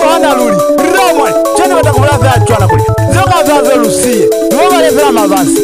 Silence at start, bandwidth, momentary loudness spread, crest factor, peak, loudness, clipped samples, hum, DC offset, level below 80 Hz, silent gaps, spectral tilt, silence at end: 0 s; 16 kHz; 2 LU; 8 dB; 0 dBFS; -8 LUFS; under 0.1%; none; 0.3%; -30 dBFS; none; -5 dB/octave; 0 s